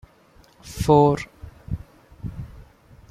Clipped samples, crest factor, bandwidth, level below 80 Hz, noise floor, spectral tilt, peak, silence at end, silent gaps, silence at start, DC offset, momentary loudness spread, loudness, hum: under 0.1%; 22 dB; 15 kHz; -42 dBFS; -54 dBFS; -7 dB/octave; -4 dBFS; 0.5 s; none; 0.65 s; under 0.1%; 23 LU; -21 LUFS; none